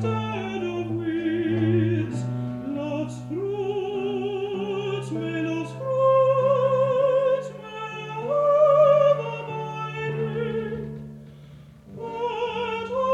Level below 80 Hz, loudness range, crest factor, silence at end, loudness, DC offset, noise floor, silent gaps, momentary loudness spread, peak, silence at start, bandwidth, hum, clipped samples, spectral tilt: -58 dBFS; 8 LU; 16 dB; 0 s; -24 LUFS; under 0.1%; -46 dBFS; none; 13 LU; -8 dBFS; 0 s; 10 kHz; none; under 0.1%; -7.5 dB/octave